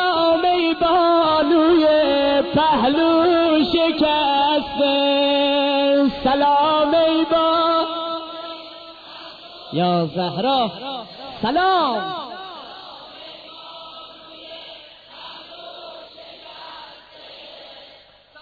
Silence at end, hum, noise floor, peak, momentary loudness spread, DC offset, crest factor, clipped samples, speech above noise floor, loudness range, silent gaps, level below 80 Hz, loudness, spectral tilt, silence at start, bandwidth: 0.55 s; none; -48 dBFS; -8 dBFS; 22 LU; under 0.1%; 12 dB; under 0.1%; 29 dB; 21 LU; none; -52 dBFS; -18 LUFS; -7.5 dB/octave; 0 s; 4.9 kHz